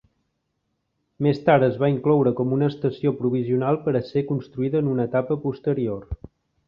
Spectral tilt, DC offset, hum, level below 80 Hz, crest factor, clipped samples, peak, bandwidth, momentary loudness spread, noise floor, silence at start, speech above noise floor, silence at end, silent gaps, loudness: -10.5 dB/octave; under 0.1%; none; -50 dBFS; 18 dB; under 0.1%; -4 dBFS; 5.6 kHz; 8 LU; -75 dBFS; 1.2 s; 53 dB; 0.5 s; none; -22 LUFS